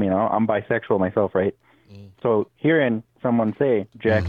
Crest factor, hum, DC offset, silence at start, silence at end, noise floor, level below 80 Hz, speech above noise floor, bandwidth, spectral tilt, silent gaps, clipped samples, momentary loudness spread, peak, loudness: 16 dB; none; under 0.1%; 0 s; 0 s; -45 dBFS; -58 dBFS; 25 dB; 5.6 kHz; -9.5 dB/octave; none; under 0.1%; 4 LU; -6 dBFS; -22 LUFS